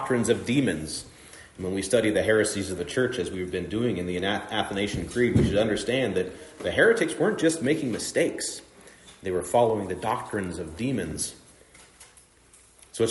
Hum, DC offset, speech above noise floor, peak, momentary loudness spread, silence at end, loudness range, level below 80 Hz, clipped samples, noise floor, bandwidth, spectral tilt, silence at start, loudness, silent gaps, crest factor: none; under 0.1%; 31 dB; -6 dBFS; 11 LU; 0 s; 5 LU; -50 dBFS; under 0.1%; -56 dBFS; 11.5 kHz; -4.5 dB/octave; 0 s; -26 LUFS; none; 20 dB